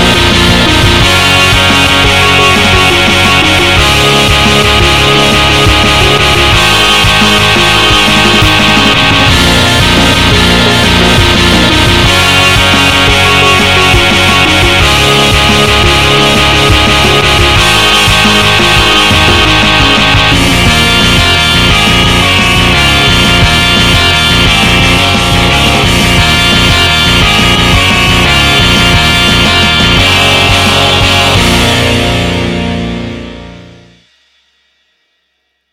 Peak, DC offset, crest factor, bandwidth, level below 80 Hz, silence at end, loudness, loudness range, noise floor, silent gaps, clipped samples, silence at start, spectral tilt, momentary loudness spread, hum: 0 dBFS; 2%; 6 dB; 17 kHz; -18 dBFS; 2 s; -5 LUFS; 1 LU; -61 dBFS; none; 1%; 0 s; -3.5 dB/octave; 1 LU; none